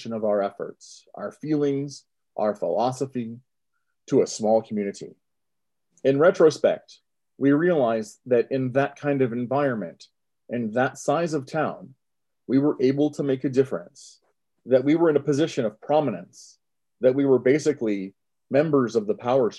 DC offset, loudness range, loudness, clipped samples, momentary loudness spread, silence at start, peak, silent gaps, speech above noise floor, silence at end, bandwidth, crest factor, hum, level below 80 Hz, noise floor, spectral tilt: under 0.1%; 5 LU; -23 LUFS; under 0.1%; 15 LU; 0 s; -6 dBFS; none; 63 dB; 0 s; 11.5 kHz; 18 dB; none; -72 dBFS; -86 dBFS; -6.5 dB/octave